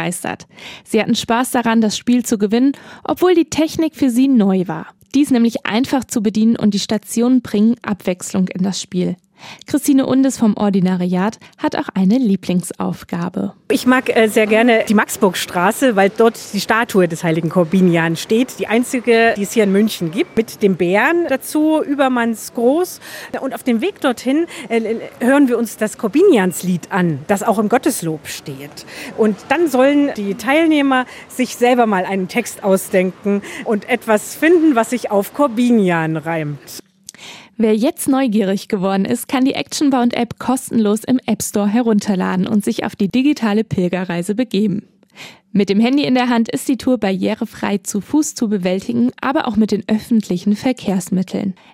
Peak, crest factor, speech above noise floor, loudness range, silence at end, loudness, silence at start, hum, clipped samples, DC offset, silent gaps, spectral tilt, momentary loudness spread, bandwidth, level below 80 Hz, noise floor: 0 dBFS; 16 dB; 23 dB; 3 LU; 0.2 s; -16 LUFS; 0 s; none; under 0.1%; under 0.1%; none; -5.5 dB/octave; 9 LU; 16 kHz; -56 dBFS; -39 dBFS